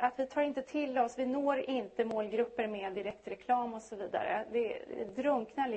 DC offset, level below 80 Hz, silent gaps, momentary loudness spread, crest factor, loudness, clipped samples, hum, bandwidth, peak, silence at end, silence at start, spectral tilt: under 0.1%; -72 dBFS; none; 8 LU; 18 dB; -35 LUFS; under 0.1%; none; 8.4 kHz; -16 dBFS; 0 s; 0 s; -5.5 dB/octave